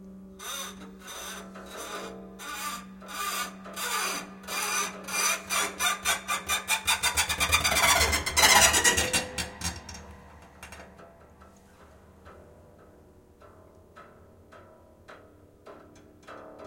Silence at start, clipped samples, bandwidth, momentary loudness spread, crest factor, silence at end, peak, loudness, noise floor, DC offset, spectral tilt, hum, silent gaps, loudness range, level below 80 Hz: 0 s; under 0.1%; 17 kHz; 23 LU; 26 dB; 0 s; -4 dBFS; -25 LUFS; -55 dBFS; under 0.1%; -0.5 dB/octave; none; none; 15 LU; -50 dBFS